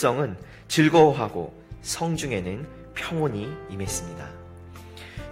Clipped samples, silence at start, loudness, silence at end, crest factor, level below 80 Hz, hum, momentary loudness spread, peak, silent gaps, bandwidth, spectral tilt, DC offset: under 0.1%; 0 s; -25 LUFS; 0 s; 20 dB; -48 dBFS; none; 23 LU; -6 dBFS; none; 16 kHz; -5 dB/octave; under 0.1%